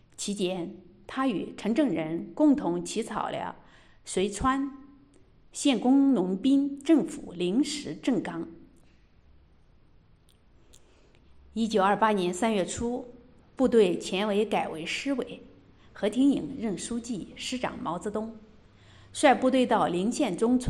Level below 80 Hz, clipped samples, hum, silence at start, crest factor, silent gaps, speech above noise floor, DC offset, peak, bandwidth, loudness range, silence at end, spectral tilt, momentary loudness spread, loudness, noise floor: -56 dBFS; under 0.1%; none; 0.2 s; 20 dB; none; 33 dB; under 0.1%; -8 dBFS; 12 kHz; 7 LU; 0 s; -5 dB/octave; 14 LU; -27 LUFS; -59 dBFS